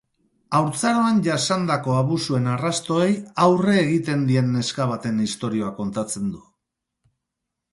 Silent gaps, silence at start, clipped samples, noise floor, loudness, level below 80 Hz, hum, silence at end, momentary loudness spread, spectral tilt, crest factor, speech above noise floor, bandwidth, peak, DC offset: none; 0.5 s; under 0.1%; -82 dBFS; -21 LUFS; -60 dBFS; none; 1.35 s; 8 LU; -5.5 dB/octave; 18 dB; 61 dB; 11.5 kHz; -4 dBFS; under 0.1%